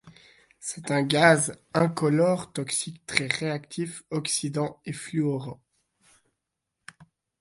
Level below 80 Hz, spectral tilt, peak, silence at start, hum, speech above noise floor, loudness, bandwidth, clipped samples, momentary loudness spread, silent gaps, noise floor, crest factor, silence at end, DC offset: -64 dBFS; -4.5 dB/octave; -2 dBFS; 0.05 s; none; 57 dB; -26 LUFS; 12 kHz; under 0.1%; 14 LU; none; -83 dBFS; 26 dB; 0.35 s; under 0.1%